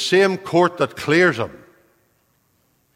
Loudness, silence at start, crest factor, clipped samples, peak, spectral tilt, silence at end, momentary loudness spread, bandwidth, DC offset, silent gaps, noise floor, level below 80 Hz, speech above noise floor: -18 LUFS; 0 s; 18 dB; under 0.1%; -2 dBFS; -5 dB/octave; 1.4 s; 10 LU; 15.5 kHz; under 0.1%; none; -64 dBFS; -60 dBFS; 46 dB